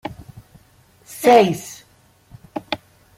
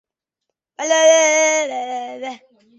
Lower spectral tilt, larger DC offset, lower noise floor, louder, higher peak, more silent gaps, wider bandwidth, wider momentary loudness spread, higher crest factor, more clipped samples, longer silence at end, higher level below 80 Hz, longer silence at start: first, -5 dB/octave vs 1.5 dB/octave; neither; second, -54 dBFS vs -80 dBFS; about the same, -17 LUFS vs -15 LUFS; about the same, -2 dBFS vs -2 dBFS; neither; first, 16.5 kHz vs 8.2 kHz; first, 24 LU vs 18 LU; about the same, 20 dB vs 16 dB; neither; about the same, 0.4 s vs 0.45 s; first, -56 dBFS vs -76 dBFS; second, 0.05 s vs 0.8 s